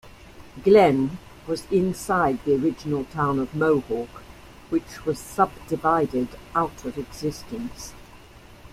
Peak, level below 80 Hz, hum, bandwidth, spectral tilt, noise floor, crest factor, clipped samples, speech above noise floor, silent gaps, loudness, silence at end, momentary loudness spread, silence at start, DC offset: -4 dBFS; -50 dBFS; none; 15.5 kHz; -6.5 dB/octave; -47 dBFS; 20 dB; under 0.1%; 24 dB; none; -24 LUFS; 0.05 s; 15 LU; 0.05 s; under 0.1%